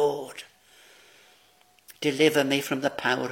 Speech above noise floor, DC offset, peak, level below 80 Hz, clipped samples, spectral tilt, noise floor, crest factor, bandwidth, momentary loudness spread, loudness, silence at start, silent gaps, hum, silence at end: 36 dB; under 0.1%; -6 dBFS; -74 dBFS; under 0.1%; -4 dB/octave; -61 dBFS; 22 dB; 17 kHz; 16 LU; -25 LUFS; 0 s; none; none; 0 s